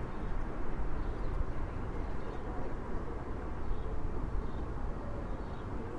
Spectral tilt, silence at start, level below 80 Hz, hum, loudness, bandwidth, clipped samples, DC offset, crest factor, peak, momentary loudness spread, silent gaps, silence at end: -8.5 dB/octave; 0 s; -38 dBFS; none; -41 LUFS; 5.6 kHz; under 0.1%; under 0.1%; 14 dB; -20 dBFS; 2 LU; none; 0 s